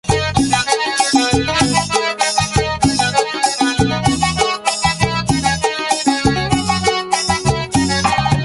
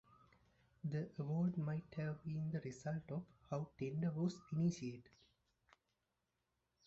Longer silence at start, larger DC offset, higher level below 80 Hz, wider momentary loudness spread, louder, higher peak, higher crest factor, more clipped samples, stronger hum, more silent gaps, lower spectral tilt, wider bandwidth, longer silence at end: second, 0.05 s vs 0.85 s; neither; first, -32 dBFS vs -76 dBFS; second, 3 LU vs 9 LU; first, -15 LUFS vs -44 LUFS; first, -2 dBFS vs -28 dBFS; about the same, 14 dB vs 16 dB; neither; neither; neither; second, -3.5 dB/octave vs -8.5 dB/octave; first, 11.5 kHz vs 8 kHz; second, 0 s vs 1.85 s